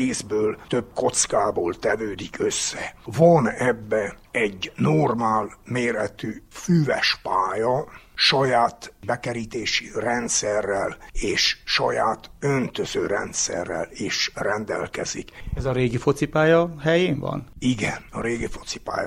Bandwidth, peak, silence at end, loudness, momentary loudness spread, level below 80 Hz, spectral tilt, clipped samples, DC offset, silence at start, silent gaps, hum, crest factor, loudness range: 15.5 kHz; -4 dBFS; 0 s; -23 LUFS; 10 LU; -44 dBFS; -4 dB/octave; under 0.1%; under 0.1%; 0 s; none; none; 20 dB; 3 LU